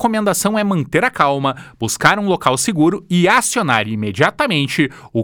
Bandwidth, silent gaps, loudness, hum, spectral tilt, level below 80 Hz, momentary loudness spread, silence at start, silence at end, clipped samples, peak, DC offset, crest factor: over 20 kHz; none; -16 LUFS; none; -4 dB/octave; -50 dBFS; 6 LU; 0 s; 0 s; under 0.1%; 0 dBFS; under 0.1%; 16 dB